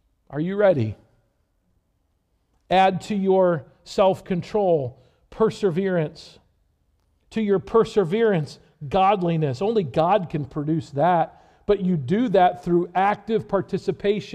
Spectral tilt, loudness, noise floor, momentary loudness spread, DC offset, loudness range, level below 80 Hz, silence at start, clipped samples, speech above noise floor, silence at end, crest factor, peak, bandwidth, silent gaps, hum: -7.5 dB/octave; -22 LUFS; -69 dBFS; 10 LU; under 0.1%; 3 LU; -54 dBFS; 0.3 s; under 0.1%; 48 dB; 0 s; 16 dB; -8 dBFS; 10.5 kHz; none; none